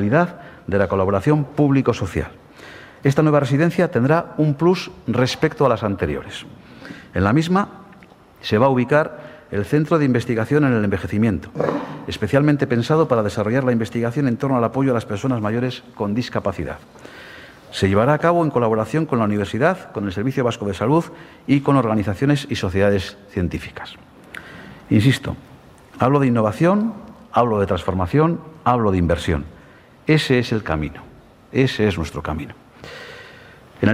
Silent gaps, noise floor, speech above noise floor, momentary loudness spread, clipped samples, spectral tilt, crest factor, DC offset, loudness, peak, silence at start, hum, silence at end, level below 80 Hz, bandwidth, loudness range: none; -46 dBFS; 28 dB; 19 LU; under 0.1%; -7 dB/octave; 20 dB; under 0.1%; -19 LUFS; 0 dBFS; 0 s; none; 0 s; -46 dBFS; 14.5 kHz; 3 LU